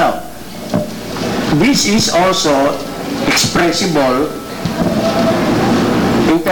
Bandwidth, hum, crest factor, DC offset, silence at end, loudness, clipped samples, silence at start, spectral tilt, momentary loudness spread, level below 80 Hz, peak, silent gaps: 19.5 kHz; none; 10 dB; under 0.1%; 0 s; -14 LUFS; under 0.1%; 0 s; -4 dB/octave; 10 LU; -36 dBFS; -4 dBFS; none